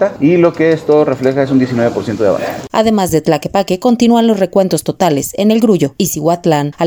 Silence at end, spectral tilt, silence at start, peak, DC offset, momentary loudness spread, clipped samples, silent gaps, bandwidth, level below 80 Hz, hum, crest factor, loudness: 0 s; -6 dB/octave; 0 s; 0 dBFS; under 0.1%; 5 LU; under 0.1%; none; over 20 kHz; -46 dBFS; none; 12 dB; -12 LUFS